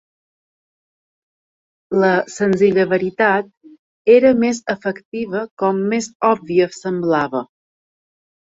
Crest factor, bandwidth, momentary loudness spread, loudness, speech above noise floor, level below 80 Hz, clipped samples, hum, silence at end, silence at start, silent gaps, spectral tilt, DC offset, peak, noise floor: 18 dB; 8 kHz; 11 LU; -17 LUFS; over 74 dB; -60 dBFS; under 0.1%; none; 1.05 s; 1.9 s; 3.57-3.61 s, 3.79-4.05 s, 5.05-5.12 s, 5.51-5.57 s, 6.15-6.20 s; -6 dB/octave; under 0.1%; -2 dBFS; under -90 dBFS